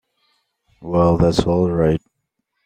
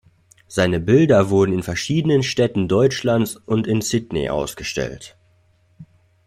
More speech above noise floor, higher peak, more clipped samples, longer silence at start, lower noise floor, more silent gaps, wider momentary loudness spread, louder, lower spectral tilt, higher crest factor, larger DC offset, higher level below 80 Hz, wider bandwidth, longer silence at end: first, 58 dB vs 40 dB; about the same, -2 dBFS vs -4 dBFS; neither; first, 0.8 s vs 0.5 s; first, -75 dBFS vs -58 dBFS; neither; about the same, 9 LU vs 10 LU; about the same, -18 LUFS vs -19 LUFS; first, -7.5 dB/octave vs -5.5 dB/octave; about the same, 18 dB vs 16 dB; neither; first, -38 dBFS vs -48 dBFS; second, 10 kHz vs 15.5 kHz; first, 0.7 s vs 0.4 s